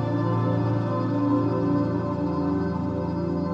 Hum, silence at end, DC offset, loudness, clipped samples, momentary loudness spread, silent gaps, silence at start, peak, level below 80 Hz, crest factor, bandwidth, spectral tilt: none; 0 s; under 0.1%; -25 LUFS; under 0.1%; 4 LU; none; 0 s; -12 dBFS; -48 dBFS; 12 dB; 7 kHz; -10 dB/octave